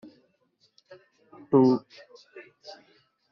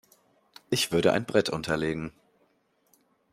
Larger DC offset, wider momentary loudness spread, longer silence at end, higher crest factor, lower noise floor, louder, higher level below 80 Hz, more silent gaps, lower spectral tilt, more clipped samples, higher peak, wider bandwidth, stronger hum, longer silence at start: neither; first, 28 LU vs 10 LU; second, 0.6 s vs 1.25 s; about the same, 22 dB vs 24 dB; about the same, -69 dBFS vs -69 dBFS; first, -23 LUFS vs -27 LUFS; second, -74 dBFS vs -60 dBFS; neither; first, -8 dB/octave vs -4.5 dB/octave; neither; about the same, -8 dBFS vs -6 dBFS; second, 6.4 kHz vs 16 kHz; neither; first, 1.5 s vs 0.7 s